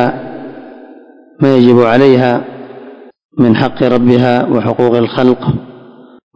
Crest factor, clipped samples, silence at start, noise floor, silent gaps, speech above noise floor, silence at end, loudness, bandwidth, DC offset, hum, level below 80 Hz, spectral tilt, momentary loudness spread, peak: 12 dB; 2%; 0 s; -38 dBFS; 3.25-3.29 s; 29 dB; 0.6 s; -10 LUFS; 6.8 kHz; under 0.1%; none; -46 dBFS; -8.5 dB/octave; 21 LU; 0 dBFS